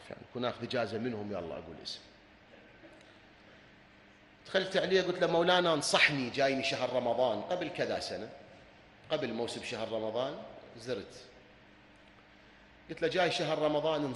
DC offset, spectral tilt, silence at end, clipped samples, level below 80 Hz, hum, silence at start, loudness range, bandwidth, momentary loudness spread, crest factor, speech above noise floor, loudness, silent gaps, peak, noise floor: under 0.1%; -4 dB/octave; 0 s; under 0.1%; -68 dBFS; none; 0 s; 13 LU; 11.5 kHz; 17 LU; 24 dB; 27 dB; -32 LUFS; none; -10 dBFS; -59 dBFS